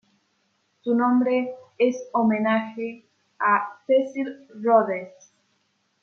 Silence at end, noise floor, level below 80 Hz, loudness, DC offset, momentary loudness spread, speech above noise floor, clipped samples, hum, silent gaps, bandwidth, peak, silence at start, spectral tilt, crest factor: 0.95 s; -70 dBFS; -78 dBFS; -23 LUFS; under 0.1%; 13 LU; 47 dB; under 0.1%; none; none; 6.8 kHz; -6 dBFS; 0.85 s; -6.5 dB/octave; 18 dB